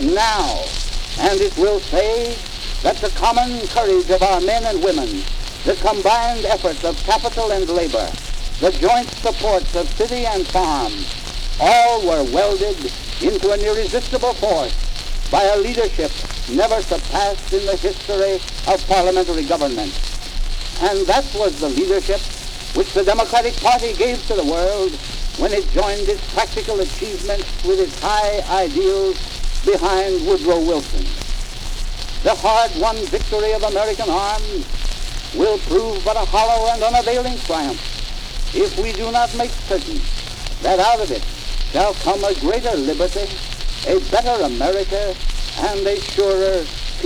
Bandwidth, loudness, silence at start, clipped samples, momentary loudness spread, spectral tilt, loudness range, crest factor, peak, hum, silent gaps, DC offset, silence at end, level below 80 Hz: 15 kHz; -19 LUFS; 0 s; under 0.1%; 11 LU; -3.5 dB/octave; 2 LU; 14 dB; -4 dBFS; none; none; under 0.1%; 0 s; -24 dBFS